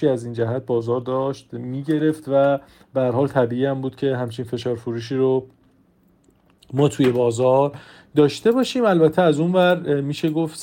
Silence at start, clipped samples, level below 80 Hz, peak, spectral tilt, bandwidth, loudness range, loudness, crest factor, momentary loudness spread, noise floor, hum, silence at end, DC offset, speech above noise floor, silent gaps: 0 s; under 0.1%; -60 dBFS; -4 dBFS; -7 dB/octave; 17 kHz; 6 LU; -20 LUFS; 16 dB; 9 LU; -58 dBFS; none; 0 s; under 0.1%; 38 dB; none